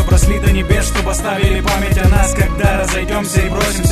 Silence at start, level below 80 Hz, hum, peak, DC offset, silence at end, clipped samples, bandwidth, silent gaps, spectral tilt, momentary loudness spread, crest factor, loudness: 0 s; -16 dBFS; none; 0 dBFS; under 0.1%; 0 s; under 0.1%; 14 kHz; none; -5 dB/octave; 4 LU; 12 dB; -15 LUFS